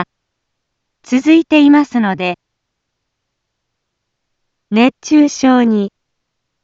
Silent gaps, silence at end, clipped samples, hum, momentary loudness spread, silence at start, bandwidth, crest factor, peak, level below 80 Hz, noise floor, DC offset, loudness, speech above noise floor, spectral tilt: none; 0.75 s; under 0.1%; none; 12 LU; 0 s; 7.8 kHz; 14 dB; 0 dBFS; -60 dBFS; -73 dBFS; under 0.1%; -12 LUFS; 63 dB; -5 dB/octave